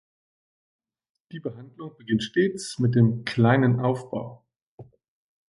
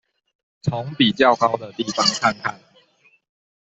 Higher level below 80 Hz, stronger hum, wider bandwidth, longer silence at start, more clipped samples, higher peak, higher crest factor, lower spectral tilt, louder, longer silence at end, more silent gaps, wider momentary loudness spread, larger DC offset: about the same, -62 dBFS vs -60 dBFS; neither; first, 11.5 kHz vs 8.4 kHz; first, 1.35 s vs 0.65 s; neither; second, -6 dBFS vs -2 dBFS; about the same, 20 dB vs 20 dB; first, -7 dB/octave vs -4 dB/octave; second, -23 LUFS vs -20 LUFS; second, 0.65 s vs 1.05 s; first, 4.56-4.78 s vs none; first, 20 LU vs 12 LU; neither